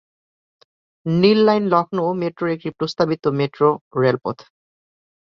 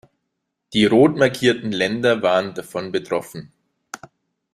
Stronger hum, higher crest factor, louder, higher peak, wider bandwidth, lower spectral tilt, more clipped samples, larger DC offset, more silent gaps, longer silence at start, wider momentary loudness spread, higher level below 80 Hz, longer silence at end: neither; about the same, 18 dB vs 18 dB; about the same, -19 LUFS vs -19 LUFS; about the same, -2 dBFS vs -2 dBFS; second, 7.2 kHz vs 15.5 kHz; first, -7.5 dB/octave vs -5.5 dB/octave; neither; neither; first, 3.81-3.91 s vs none; first, 1.05 s vs 0.7 s; second, 10 LU vs 23 LU; about the same, -60 dBFS vs -58 dBFS; first, 0.9 s vs 0.55 s